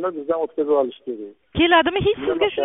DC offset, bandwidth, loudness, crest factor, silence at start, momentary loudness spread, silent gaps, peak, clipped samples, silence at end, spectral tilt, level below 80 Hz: under 0.1%; 3.9 kHz; -20 LUFS; 18 dB; 0 s; 16 LU; none; -4 dBFS; under 0.1%; 0 s; -2.5 dB/octave; -46 dBFS